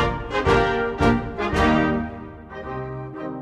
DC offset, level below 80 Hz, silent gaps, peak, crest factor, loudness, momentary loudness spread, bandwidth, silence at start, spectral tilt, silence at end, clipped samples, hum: under 0.1%; -34 dBFS; none; -6 dBFS; 16 dB; -22 LUFS; 14 LU; 12 kHz; 0 s; -6.5 dB/octave; 0 s; under 0.1%; none